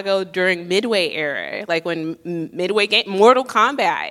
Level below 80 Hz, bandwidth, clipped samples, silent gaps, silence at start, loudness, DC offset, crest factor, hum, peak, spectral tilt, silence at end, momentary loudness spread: -70 dBFS; 15.5 kHz; under 0.1%; none; 0 s; -18 LUFS; under 0.1%; 18 dB; none; 0 dBFS; -4 dB/octave; 0 s; 12 LU